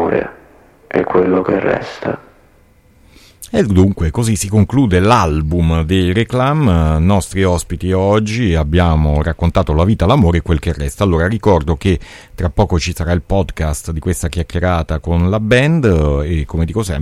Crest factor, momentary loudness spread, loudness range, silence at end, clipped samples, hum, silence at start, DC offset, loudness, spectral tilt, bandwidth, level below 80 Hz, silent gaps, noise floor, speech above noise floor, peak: 14 dB; 8 LU; 4 LU; 0 s; under 0.1%; none; 0 s; under 0.1%; -15 LUFS; -6.5 dB/octave; 13.5 kHz; -24 dBFS; none; -49 dBFS; 35 dB; 0 dBFS